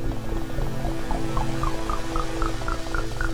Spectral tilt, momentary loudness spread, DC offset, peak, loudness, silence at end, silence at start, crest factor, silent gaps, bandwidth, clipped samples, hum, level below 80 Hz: -5.5 dB/octave; 3 LU; under 0.1%; -10 dBFS; -29 LUFS; 0 s; 0 s; 14 dB; none; 16 kHz; under 0.1%; none; -28 dBFS